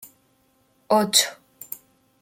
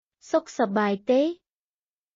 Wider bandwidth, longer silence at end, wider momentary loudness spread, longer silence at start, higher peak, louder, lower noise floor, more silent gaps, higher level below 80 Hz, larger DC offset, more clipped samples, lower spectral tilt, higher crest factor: first, 17 kHz vs 7.6 kHz; second, 0.45 s vs 0.8 s; first, 21 LU vs 6 LU; second, 0 s vs 0.25 s; first, -2 dBFS vs -12 dBFS; first, -20 LUFS vs -25 LUFS; second, -64 dBFS vs under -90 dBFS; neither; about the same, -72 dBFS vs -74 dBFS; neither; neither; second, -1.5 dB/octave vs -4.5 dB/octave; first, 24 dB vs 16 dB